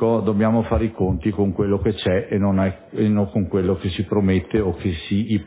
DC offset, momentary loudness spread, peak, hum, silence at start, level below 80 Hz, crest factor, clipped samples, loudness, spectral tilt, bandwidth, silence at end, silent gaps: under 0.1%; 4 LU; -6 dBFS; none; 0 s; -36 dBFS; 14 dB; under 0.1%; -21 LUFS; -12 dB/octave; 4 kHz; 0 s; none